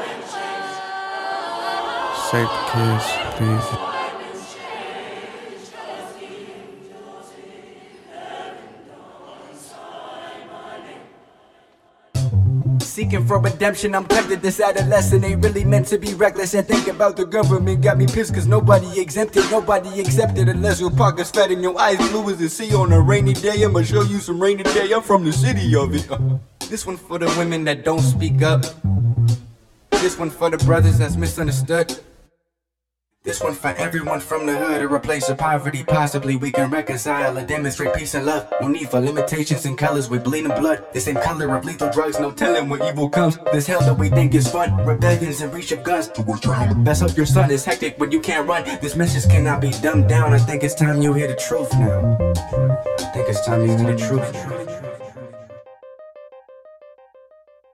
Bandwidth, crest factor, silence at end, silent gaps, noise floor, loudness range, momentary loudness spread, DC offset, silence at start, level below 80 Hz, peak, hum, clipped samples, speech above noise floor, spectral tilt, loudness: 15.5 kHz; 18 dB; 1.05 s; none; -82 dBFS; 17 LU; 15 LU; under 0.1%; 0 s; -40 dBFS; 0 dBFS; none; under 0.1%; 64 dB; -6 dB/octave; -19 LUFS